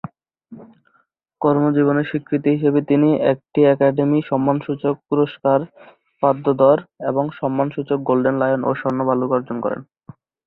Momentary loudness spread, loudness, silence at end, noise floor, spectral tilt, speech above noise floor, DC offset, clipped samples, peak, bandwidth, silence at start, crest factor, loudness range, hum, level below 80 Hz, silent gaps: 7 LU; -19 LUFS; 0.65 s; -63 dBFS; -11 dB/octave; 45 dB; under 0.1%; under 0.1%; -2 dBFS; 4.2 kHz; 0.05 s; 18 dB; 3 LU; none; -60 dBFS; none